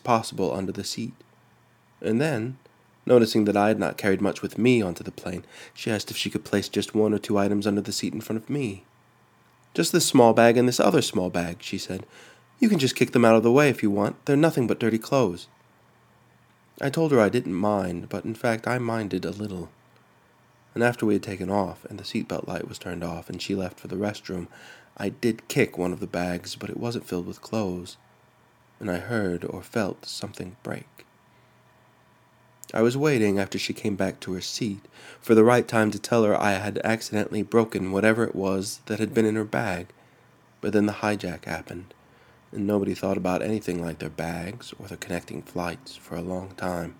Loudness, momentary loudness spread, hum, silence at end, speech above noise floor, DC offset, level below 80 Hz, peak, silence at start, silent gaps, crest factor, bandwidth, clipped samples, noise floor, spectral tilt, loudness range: -25 LUFS; 15 LU; none; 0.05 s; 35 dB; under 0.1%; -62 dBFS; -2 dBFS; 0.05 s; none; 24 dB; 19 kHz; under 0.1%; -59 dBFS; -5.5 dB/octave; 10 LU